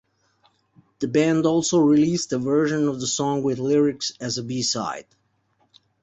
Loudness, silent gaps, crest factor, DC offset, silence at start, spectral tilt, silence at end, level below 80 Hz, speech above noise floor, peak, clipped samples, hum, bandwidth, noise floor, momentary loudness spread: -22 LUFS; none; 16 dB; under 0.1%; 1 s; -4.5 dB/octave; 1 s; -62 dBFS; 45 dB; -8 dBFS; under 0.1%; none; 8.2 kHz; -67 dBFS; 10 LU